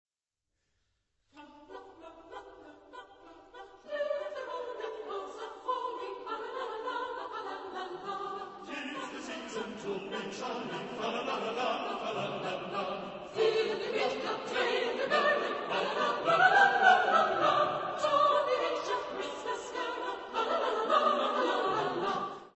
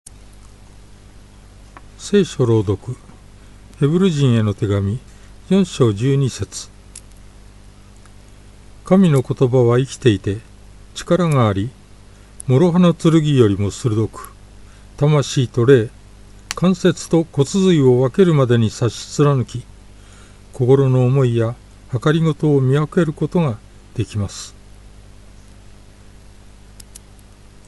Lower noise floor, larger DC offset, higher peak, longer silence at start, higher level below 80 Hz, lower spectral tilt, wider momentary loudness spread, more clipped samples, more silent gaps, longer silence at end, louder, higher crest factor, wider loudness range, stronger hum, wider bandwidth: first, -88 dBFS vs -43 dBFS; neither; second, -10 dBFS vs 0 dBFS; second, 1.35 s vs 2 s; second, -72 dBFS vs -44 dBFS; second, -3.5 dB/octave vs -7 dB/octave; about the same, 15 LU vs 16 LU; neither; neither; second, 0.1 s vs 0.85 s; second, -32 LUFS vs -17 LUFS; first, 24 dB vs 18 dB; first, 14 LU vs 6 LU; second, none vs 50 Hz at -40 dBFS; second, 8.2 kHz vs 11.5 kHz